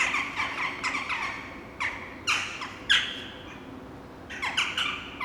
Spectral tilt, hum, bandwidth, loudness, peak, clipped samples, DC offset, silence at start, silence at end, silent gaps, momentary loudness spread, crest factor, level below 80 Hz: -1.5 dB/octave; none; over 20 kHz; -28 LUFS; -8 dBFS; under 0.1%; under 0.1%; 0 s; 0 s; none; 19 LU; 24 dB; -56 dBFS